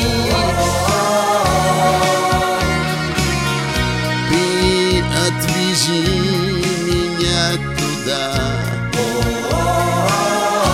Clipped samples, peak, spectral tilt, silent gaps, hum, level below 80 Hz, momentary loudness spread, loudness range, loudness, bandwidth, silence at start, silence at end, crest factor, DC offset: under 0.1%; -2 dBFS; -4 dB/octave; none; none; -30 dBFS; 4 LU; 2 LU; -16 LUFS; 17 kHz; 0 s; 0 s; 16 dB; under 0.1%